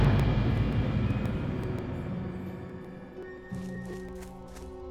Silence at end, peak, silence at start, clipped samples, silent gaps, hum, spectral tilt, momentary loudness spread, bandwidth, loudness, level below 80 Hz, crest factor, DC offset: 0 s; -12 dBFS; 0 s; under 0.1%; none; none; -8 dB/octave; 16 LU; 12.5 kHz; -32 LUFS; -38 dBFS; 18 dB; under 0.1%